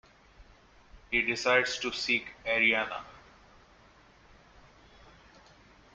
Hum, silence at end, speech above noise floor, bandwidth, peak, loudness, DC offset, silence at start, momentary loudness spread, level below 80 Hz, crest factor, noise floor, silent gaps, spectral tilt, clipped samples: none; 2.75 s; 30 dB; 9.4 kHz; -8 dBFS; -28 LUFS; under 0.1%; 0.4 s; 11 LU; -60 dBFS; 26 dB; -59 dBFS; none; -2.5 dB/octave; under 0.1%